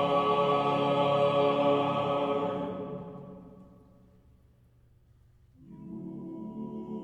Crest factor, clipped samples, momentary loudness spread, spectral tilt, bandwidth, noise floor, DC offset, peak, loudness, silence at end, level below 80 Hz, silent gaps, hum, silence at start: 16 dB; under 0.1%; 19 LU; -7.5 dB/octave; 8.8 kHz; -62 dBFS; under 0.1%; -14 dBFS; -28 LUFS; 0 s; -64 dBFS; none; none; 0 s